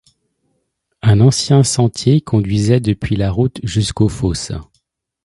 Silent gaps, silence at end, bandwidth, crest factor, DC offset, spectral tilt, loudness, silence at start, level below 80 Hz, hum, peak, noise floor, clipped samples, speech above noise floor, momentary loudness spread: none; 0.6 s; 11.5 kHz; 16 dB; under 0.1%; -6 dB/octave; -15 LUFS; 1.05 s; -36 dBFS; none; 0 dBFS; -68 dBFS; under 0.1%; 54 dB; 8 LU